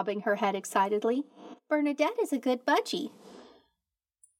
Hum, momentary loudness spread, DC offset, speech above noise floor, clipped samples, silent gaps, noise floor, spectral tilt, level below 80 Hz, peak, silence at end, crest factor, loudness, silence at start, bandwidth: none; 8 LU; under 0.1%; 58 dB; under 0.1%; none; -87 dBFS; -4 dB/octave; -90 dBFS; -12 dBFS; 0.95 s; 20 dB; -29 LUFS; 0 s; 16.5 kHz